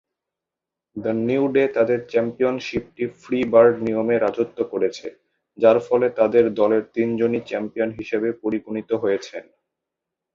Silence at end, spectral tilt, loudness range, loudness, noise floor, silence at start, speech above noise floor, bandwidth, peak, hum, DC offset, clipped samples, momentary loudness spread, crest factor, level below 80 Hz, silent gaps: 0.95 s; -7 dB/octave; 4 LU; -21 LUFS; -87 dBFS; 0.95 s; 66 dB; 7.4 kHz; -2 dBFS; none; under 0.1%; under 0.1%; 11 LU; 18 dB; -60 dBFS; none